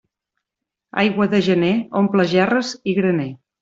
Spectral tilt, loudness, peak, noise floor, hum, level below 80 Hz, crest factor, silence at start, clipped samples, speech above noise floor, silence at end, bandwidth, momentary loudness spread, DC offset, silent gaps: -6.5 dB/octave; -18 LUFS; -2 dBFS; -83 dBFS; none; -60 dBFS; 16 dB; 0.95 s; under 0.1%; 66 dB; 0.25 s; 7.8 kHz; 6 LU; under 0.1%; none